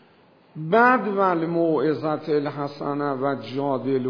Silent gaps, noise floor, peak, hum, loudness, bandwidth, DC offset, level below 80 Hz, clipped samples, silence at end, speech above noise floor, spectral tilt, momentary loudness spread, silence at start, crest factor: none; -55 dBFS; -4 dBFS; none; -23 LUFS; 5.4 kHz; under 0.1%; -74 dBFS; under 0.1%; 0 s; 33 dB; -8.5 dB/octave; 10 LU; 0.55 s; 18 dB